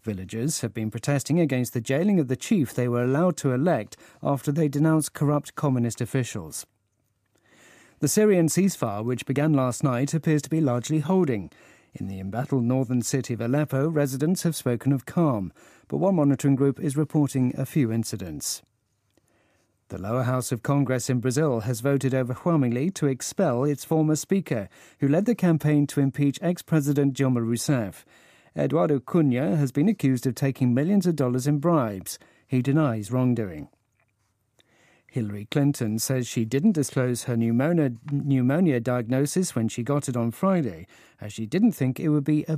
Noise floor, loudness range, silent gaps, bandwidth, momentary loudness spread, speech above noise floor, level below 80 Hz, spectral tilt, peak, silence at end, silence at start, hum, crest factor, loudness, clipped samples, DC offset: -72 dBFS; 4 LU; none; 15.5 kHz; 9 LU; 48 dB; -64 dBFS; -6.5 dB/octave; -8 dBFS; 0 s; 0.05 s; none; 16 dB; -24 LUFS; under 0.1%; under 0.1%